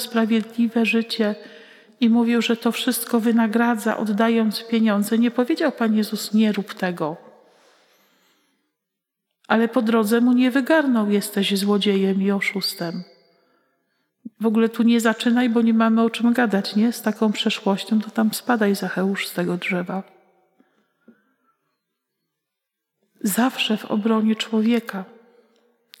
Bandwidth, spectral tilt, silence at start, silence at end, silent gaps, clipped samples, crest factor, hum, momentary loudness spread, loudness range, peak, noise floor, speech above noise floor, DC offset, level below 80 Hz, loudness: 16 kHz; -5 dB/octave; 0 s; 0.95 s; none; under 0.1%; 20 dB; none; 7 LU; 8 LU; -2 dBFS; -82 dBFS; 62 dB; under 0.1%; -88 dBFS; -20 LUFS